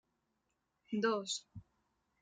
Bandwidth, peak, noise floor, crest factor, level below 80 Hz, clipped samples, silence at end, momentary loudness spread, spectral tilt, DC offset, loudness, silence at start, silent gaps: 9.4 kHz; -22 dBFS; -84 dBFS; 20 dB; -78 dBFS; under 0.1%; 0.6 s; 23 LU; -3.5 dB/octave; under 0.1%; -38 LUFS; 0.9 s; none